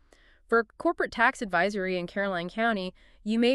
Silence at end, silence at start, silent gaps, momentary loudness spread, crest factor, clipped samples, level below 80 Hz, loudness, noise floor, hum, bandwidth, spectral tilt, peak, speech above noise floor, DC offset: 0 s; 0.5 s; none; 7 LU; 20 dB; under 0.1%; -58 dBFS; -28 LUFS; -59 dBFS; none; 11.5 kHz; -5 dB/octave; -8 dBFS; 32 dB; under 0.1%